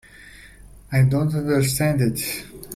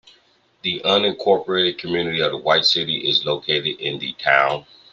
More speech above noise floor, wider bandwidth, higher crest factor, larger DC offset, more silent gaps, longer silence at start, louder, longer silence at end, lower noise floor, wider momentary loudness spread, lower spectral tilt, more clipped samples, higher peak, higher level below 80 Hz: second, 25 dB vs 38 dB; first, 16 kHz vs 7.6 kHz; second, 14 dB vs 20 dB; neither; neither; second, 0.2 s vs 0.65 s; about the same, -21 LUFS vs -19 LUFS; second, 0 s vs 0.3 s; second, -45 dBFS vs -58 dBFS; about the same, 8 LU vs 8 LU; first, -5.5 dB/octave vs -4 dB/octave; neither; second, -8 dBFS vs -2 dBFS; first, -46 dBFS vs -62 dBFS